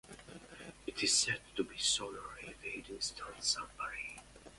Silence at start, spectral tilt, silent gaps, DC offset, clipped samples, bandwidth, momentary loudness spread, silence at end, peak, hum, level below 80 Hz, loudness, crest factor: 0.05 s; -0.5 dB/octave; none; under 0.1%; under 0.1%; 11.5 kHz; 21 LU; 0 s; -18 dBFS; none; -64 dBFS; -36 LUFS; 22 dB